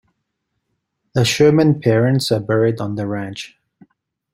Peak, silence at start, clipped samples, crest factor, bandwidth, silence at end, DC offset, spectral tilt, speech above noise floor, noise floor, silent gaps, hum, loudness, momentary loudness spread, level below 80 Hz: -2 dBFS; 1.15 s; under 0.1%; 16 dB; 16 kHz; 0.85 s; under 0.1%; -6 dB/octave; 58 dB; -74 dBFS; none; none; -17 LUFS; 14 LU; -54 dBFS